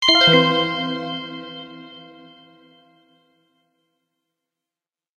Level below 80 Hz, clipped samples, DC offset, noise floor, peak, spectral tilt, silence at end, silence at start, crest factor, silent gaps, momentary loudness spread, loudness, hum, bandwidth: -60 dBFS; under 0.1%; under 0.1%; under -90 dBFS; 0 dBFS; -4 dB/octave; 3.15 s; 0 s; 24 dB; none; 27 LU; -17 LUFS; none; 11.5 kHz